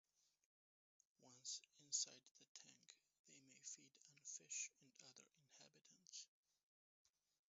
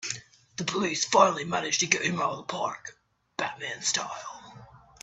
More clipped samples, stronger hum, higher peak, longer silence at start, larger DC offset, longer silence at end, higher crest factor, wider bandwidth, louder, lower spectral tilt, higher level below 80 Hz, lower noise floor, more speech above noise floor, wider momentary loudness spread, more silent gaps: neither; neither; second, -32 dBFS vs -4 dBFS; first, 1.2 s vs 0 s; neither; first, 1.3 s vs 0.25 s; about the same, 28 dB vs 26 dB; second, 7.6 kHz vs 8.6 kHz; second, -52 LUFS vs -27 LUFS; second, 0.5 dB/octave vs -2 dB/octave; second, under -90 dBFS vs -68 dBFS; first, under -90 dBFS vs -51 dBFS; first, over 31 dB vs 23 dB; about the same, 22 LU vs 20 LU; first, 2.31-2.35 s, 2.48-2.55 s, 3.19-3.24 s vs none